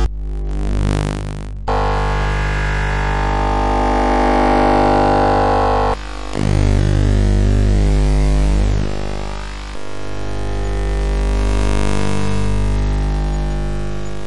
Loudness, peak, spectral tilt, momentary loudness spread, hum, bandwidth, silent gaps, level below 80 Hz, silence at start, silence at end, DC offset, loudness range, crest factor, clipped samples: -18 LUFS; -4 dBFS; -6.5 dB/octave; 12 LU; 50 Hz at -20 dBFS; 11 kHz; none; -18 dBFS; 0 s; 0 s; under 0.1%; 6 LU; 10 dB; under 0.1%